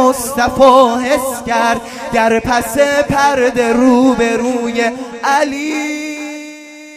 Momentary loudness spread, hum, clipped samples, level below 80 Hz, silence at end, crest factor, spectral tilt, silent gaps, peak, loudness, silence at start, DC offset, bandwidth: 11 LU; none; under 0.1%; -42 dBFS; 0 s; 12 dB; -4 dB/octave; none; 0 dBFS; -13 LUFS; 0 s; under 0.1%; 15.5 kHz